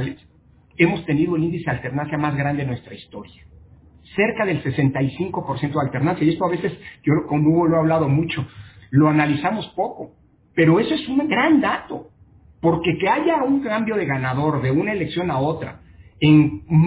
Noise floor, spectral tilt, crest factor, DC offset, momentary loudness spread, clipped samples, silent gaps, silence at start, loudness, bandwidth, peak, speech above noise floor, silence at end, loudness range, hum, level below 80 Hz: -53 dBFS; -11 dB/octave; 18 dB; under 0.1%; 12 LU; under 0.1%; none; 0 s; -20 LUFS; 4 kHz; -2 dBFS; 33 dB; 0 s; 4 LU; none; -48 dBFS